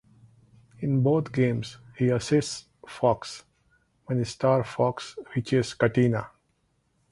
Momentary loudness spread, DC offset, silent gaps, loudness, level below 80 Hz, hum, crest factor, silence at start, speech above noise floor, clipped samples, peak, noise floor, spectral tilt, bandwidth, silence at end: 15 LU; under 0.1%; none; -26 LUFS; -58 dBFS; none; 20 dB; 0.8 s; 45 dB; under 0.1%; -6 dBFS; -71 dBFS; -6.5 dB/octave; 11.5 kHz; 0.85 s